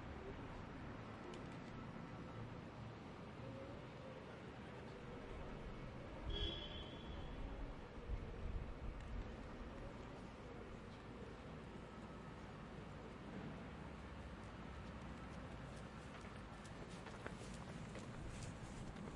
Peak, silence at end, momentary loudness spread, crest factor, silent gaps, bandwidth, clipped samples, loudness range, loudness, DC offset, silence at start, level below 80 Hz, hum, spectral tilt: -32 dBFS; 0 s; 4 LU; 20 dB; none; 11 kHz; under 0.1%; 4 LU; -53 LUFS; under 0.1%; 0 s; -56 dBFS; none; -6 dB/octave